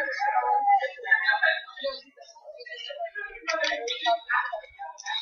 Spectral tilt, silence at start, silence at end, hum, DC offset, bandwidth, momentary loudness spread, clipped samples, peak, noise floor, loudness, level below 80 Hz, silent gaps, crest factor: 1 dB/octave; 0 s; 0 s; none; under 0.1%; 7 kHz; 17 LU; under 0.1%; -10 dBFS; -50 dBFS; -26 LUFS; -70 dBFS; none; 18 dB